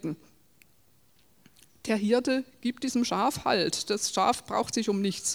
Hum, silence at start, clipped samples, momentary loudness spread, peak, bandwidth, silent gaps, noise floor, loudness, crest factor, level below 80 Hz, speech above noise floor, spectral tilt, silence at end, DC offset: none; 0.05 s; under 0.1%; 8 LU; -10 dBFS; over 20 kHz; none; -65 dBFS; -28 LUFS; 20 dB; -66 dBFS; 37 dB; -3.5 dB/octave; 0 s; under 0.1%